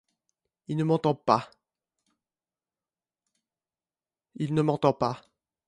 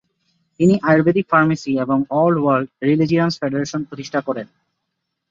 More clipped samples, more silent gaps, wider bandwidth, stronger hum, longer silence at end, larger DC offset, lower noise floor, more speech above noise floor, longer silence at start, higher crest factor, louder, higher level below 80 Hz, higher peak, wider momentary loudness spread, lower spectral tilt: neither; neither; first, 10.5 kHz vs 7.6 kHz; neither; second, 0.5 s vs 0.85 s; neither; first, under -90 dBFS vs -76 dBFS; first, over 64 dB vs 59 dB; about the same, 0.7 s vs 0.6 s; first, 26 dB vs 16 dB; second, -27 LUFS vs -18 LUFS; second, -66 dBFS vs -58 dBFS; second, -6 dBFS vs -2 dBFS; about the same, 11 LU vs 10 LU; about the same, -8 dB/octave vs -7 dB/octave